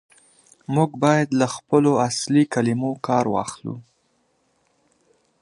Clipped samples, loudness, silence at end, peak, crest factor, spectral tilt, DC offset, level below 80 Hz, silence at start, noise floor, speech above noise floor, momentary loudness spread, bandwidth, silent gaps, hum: under 0.1%; -21 LUFS; 1.6 s; -2 dBFS; 20 dB; -6 dB/octave; under 0.1%; -62 dBFS; 0.7 s; -66 dBFS; 46 dB; 14 LU; 11.5 kHz; none; none